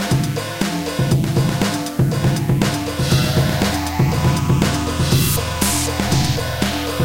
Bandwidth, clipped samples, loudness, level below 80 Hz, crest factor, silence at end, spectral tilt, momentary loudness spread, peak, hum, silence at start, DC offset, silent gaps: 17 kHz; under 0.1%; -18 LUFS; -32 dBFS; 16 dB; 0 s; -5 dB/octave; 4 LU; -2 dBFS; none; 0 s; under 0.1%; none